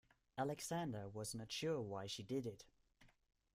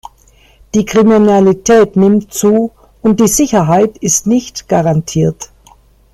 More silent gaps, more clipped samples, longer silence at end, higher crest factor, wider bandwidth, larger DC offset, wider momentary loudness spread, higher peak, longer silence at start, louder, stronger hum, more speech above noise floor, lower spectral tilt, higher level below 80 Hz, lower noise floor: neither; neither; second, 0.45 s vs 0.7 s; first, 18 dB vs 12 dB; about the same, 16 kHz vs 15.5 kHz; neither; about the same, 7 LU vs 8 LU; second, -30 dBFS vs 0 dBFS; second, 0.35 s vs 0.75 s; second, -46 LUFS vs -11 LUFS; neither; second, 27 dB vs 36 dB; about the same, -4.5 dB/octave vs -5.5 dB/octave; second, -76 dBFS vs -42 dBFS; first, -73 dBFS vs -46 dBFS